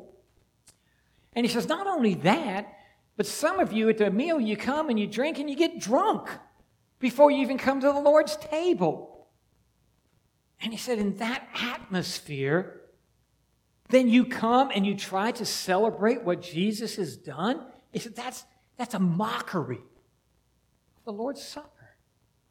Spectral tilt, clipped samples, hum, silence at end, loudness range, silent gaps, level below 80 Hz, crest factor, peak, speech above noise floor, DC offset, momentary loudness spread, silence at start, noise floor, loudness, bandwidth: -5 dB/octave; under 0.1%; none; 0.9 s; 8 LU; none; -66 dBFS; 22 dB; -6 dBFS; 44 dB; under 0.1%; 16 LU; 0 s; -69 dBFS; -26 LUFS; 17.5 kHz